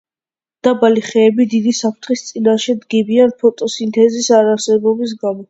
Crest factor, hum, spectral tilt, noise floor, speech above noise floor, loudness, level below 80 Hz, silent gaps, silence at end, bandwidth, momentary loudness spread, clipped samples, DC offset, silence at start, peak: 14 dB; none; -4.5 dB/octave; under -90 dBFS; over 77 dB; -14 LUFS; -62 dBFS; none; 0.05 s; 8 kHz; 7 LU; under 0.1%; under 0.1%; 0.65 s; 0 dBFS